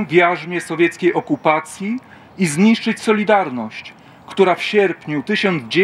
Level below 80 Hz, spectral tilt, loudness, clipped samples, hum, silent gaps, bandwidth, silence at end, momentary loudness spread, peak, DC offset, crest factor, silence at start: -66 dBFS; -5 dB/octave; -17 LUFS; under 0.1%; none; none; 13.5 kHz; 0 s; 12 LU; 0 dBFS; under 0.1%; 18 dB; 0 s